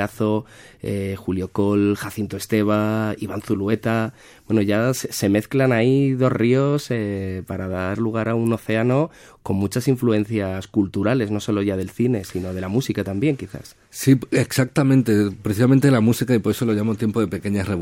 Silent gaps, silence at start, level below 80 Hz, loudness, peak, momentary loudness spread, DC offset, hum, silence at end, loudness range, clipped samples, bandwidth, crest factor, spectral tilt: none; 0 s; -56 dBFS; -21 LUFS; -4 dBFS; 10 LU; under 0.1%; none; 0 s; 4 LU; under 0.1%; 17 kHz; 16 dB; -6.5 dB/octave